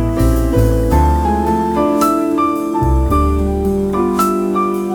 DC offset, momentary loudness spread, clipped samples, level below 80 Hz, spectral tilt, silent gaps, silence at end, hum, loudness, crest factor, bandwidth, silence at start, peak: under 0.1%; 3 LU; under 0.1%; -20 dBFS; -7.5 dB/octave; none; 0 s; none; -15 LUFS; 12 dB; 19.5 kHz; 0 s; -2 dBFS